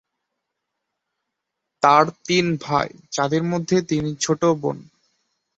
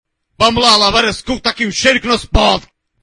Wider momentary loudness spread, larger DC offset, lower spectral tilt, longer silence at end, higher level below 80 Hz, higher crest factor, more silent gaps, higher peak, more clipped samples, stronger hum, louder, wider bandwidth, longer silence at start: about the same, 9 LU vs 8 LU; neither; first, -5 dB/octave vs -3 dB/octave; first, 0.75 s vs 0.4 s; second, -58 dBFS vs -26 dBFS; first, 22 dB vs 14 dB; neither; about the same, -2 dBFS vs 0 dBFS; second, under 0.1% vs 0.1%; neither; second, -20 LUFS vs -12 LUFS; second, 8.2 kHz vs 12 kHz; first, 1.8 s vs 0.4 s